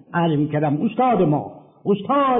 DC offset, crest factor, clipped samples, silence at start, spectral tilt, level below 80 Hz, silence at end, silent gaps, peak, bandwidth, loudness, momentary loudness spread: under 0.1%; 12 dB; under 0.1%; 0.1 s; -12 dB/octave; -56 dBFS; 0 s; none; -8 dBFS; 3.8 kHz; -20 LUFS; 7 LU